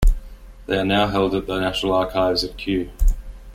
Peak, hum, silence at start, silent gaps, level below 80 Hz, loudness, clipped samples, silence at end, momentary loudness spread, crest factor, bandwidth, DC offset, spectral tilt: -4 dBFS; none; 0 s; none; -24 dBFS; -21 LUFS; under 0.1%; 0 s; 7 LU; 16 dB; 15 kHz; under 0.1%; -5.5 dB/octave